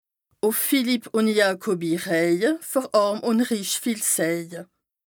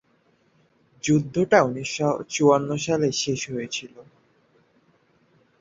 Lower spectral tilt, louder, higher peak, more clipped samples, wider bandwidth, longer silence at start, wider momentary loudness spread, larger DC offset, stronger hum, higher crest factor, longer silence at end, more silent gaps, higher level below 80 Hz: second, -3.5 dB/octave vs -5 dB/octave; about the same, -22 LUFS vs -23 LUFS; second, -6 dBFS vs -2 dBFS; neither; first, over 20 kHz vs 7.8 kHz; second, 0.45 s vs 1.05 s; second, 5 LU vs 10 LU; neither; neither; second, 18 dB vs 24 dB; second, 0.45 s vs 1.6 s; neither; second, -78 dBFS vs -60 dBFS